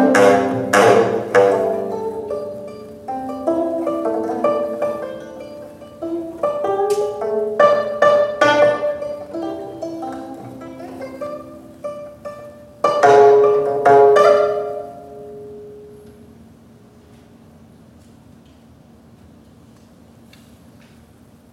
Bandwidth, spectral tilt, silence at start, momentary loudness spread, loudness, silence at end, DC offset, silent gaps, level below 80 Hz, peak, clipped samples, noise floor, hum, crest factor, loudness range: 13.5 kHz; -5 dB/octave; 0 s; 23 LU; -16 LUFS; 5.4 s; under 0.1%; none; -58 dBFS; 0 dBFS; under 0.1%; -47 dBFS; none; 18 dB; 14 LU